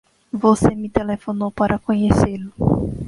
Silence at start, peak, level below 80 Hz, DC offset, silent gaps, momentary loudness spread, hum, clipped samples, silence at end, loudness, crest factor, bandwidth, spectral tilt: 0.35 s; -2 dBFS; -36 dBFS; under 0.1%; none; 8 LU; none; under 0.1%; 0 s; -19 LUFS; 18 dB; 11.5 kHz; -7.5 dB/octave